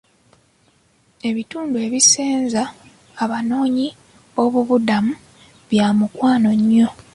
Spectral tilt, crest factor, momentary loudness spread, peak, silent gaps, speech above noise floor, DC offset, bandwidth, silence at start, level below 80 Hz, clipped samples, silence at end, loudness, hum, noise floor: -3.5 dB/octave; 18 dB; 12 LU; -2 dBFS; none; 41 dB; under 0.1%; 11.5 kHz; 1.25 s; -58 dBFS; under 0.1%; 0.2 s; -18 LUFS; none; -58 dBFS